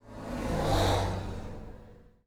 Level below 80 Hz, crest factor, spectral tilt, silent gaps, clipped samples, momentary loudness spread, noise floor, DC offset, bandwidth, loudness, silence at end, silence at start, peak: -40 dBFS; 16 dB; -5.5 dB/octave; none; under 0.1%; 20 LU; -53 dBFS; under 0.1%; 17 kHz; -31 LUFS; 0.15 s; 0.05 s; -16 dBFS